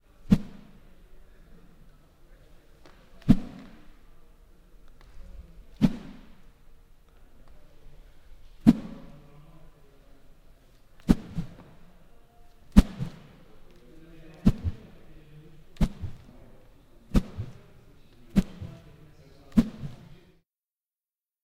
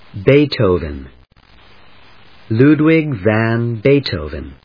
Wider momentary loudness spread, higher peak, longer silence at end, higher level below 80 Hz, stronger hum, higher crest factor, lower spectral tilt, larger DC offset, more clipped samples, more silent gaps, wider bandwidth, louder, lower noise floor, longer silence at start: first, 28 LU vs 13 LU; about the same, 0 dBFS vs 0 dBFS; first, 1.5 s vs 0.1 s; about the same, -38 dBFS vs -38 dBFS; neither; first, 30 dB vs 16 dB; second, -8 dB/octave vs -9.5 dB/octave; neither; neither; neither; first, 15.5 kHz vs 5.2 kHz; second, -27 LUFS vs -14 LUFS; first, under -90 dBFS vs -47 dBFS; first, 0.3 s vs 0.15 s